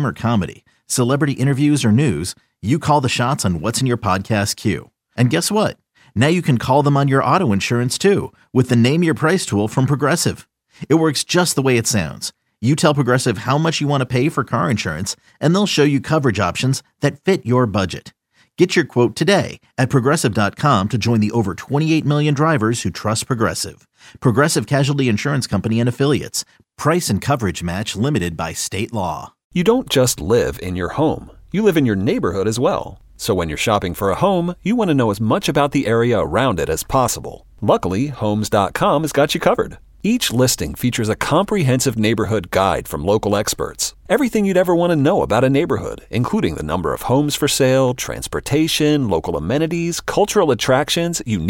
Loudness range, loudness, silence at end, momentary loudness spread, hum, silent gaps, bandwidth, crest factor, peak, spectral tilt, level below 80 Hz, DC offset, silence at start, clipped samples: 2 LU; -18 LUFS; 0 s; 7 LU; none; 29.44-29.50 s; 17 kHz; 16 dB; -2 dBFS; -5 dB/octave; -42 dBFS; under 0.1%; 0 s; under 0.1%